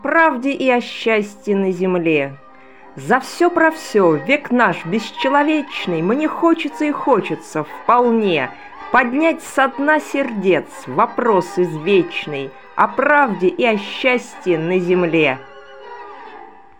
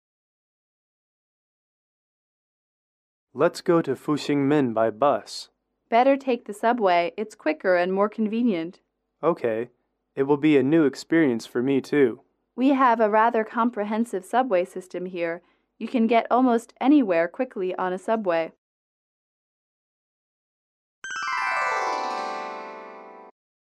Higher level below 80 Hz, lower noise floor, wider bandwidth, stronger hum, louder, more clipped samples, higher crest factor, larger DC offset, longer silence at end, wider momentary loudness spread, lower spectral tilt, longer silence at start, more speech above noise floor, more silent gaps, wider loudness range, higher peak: first, -62 dBFS vs -76 dBFS; about the same, -43 dBFS vs -43 dBFS; first, 17 kHz vs 13 kHz; neither; first, -17 LUFS vs -23 LUFS; neither; about the same, 16 dB vs 18 dB; first, 0.5% vs under 0.1%; second, 0.3 s vs 0.5 s; second, 11 LU vs 15 LU; about the same, -5.5 dB/octave vs -6 dB/octave; second, 0.05 s vs 3.35 s; first, 26 dB vs 21 dB; second, none vs 18.58-21.02 s; second, 2 LU vs 8 LU; first, 0 dBFS vs -8 dBFS